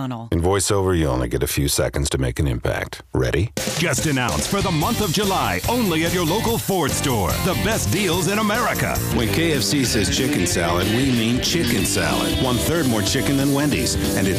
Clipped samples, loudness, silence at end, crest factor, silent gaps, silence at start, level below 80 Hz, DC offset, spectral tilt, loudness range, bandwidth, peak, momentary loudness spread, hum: under 0.1%; -20 LUFS; 0 s; 14 dB; none; 0 s; -34 dBFS; under 0.1%; -4 dB/octave; 2 LU; 15.5 kHz; -6 dBFS; 3 LU; none